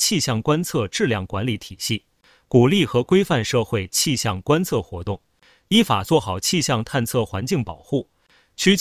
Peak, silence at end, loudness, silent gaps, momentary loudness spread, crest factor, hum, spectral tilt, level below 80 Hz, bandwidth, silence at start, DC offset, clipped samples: -2 dBFS; 0 s; -21 LUFS; none; 9 LU; 20 dB; none; -4.5 dB/octave; -46 dBFS; 16 kHz; 0 s; under 0.1%; under 0.1%